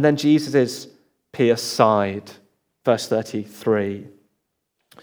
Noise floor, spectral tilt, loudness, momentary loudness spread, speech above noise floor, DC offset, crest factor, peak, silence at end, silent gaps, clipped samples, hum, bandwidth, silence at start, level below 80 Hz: -75 dBFS; -5.5 dB/octave; -20 LUFS; 15 LU; 55 dB; under 0.1%; 20 dB; 0 dBFS; 0.95 s; none; under 0.1%; none; over 20 kHz; 0 s; -76 dBFS